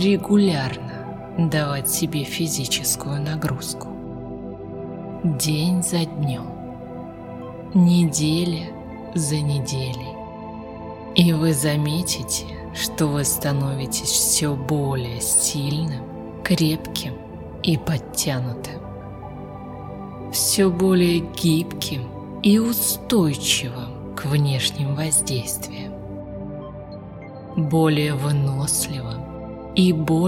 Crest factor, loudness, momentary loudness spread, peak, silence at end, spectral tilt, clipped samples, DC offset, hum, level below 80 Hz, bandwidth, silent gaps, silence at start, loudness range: 22 dB; -21 LUFS; 17 LU; 0 dBFS; 0 s; -4.5 dB/octave; under 0.1%; under 0.1%; none; -46 dBFS; 18 kHz; none; 0 s; 5 LU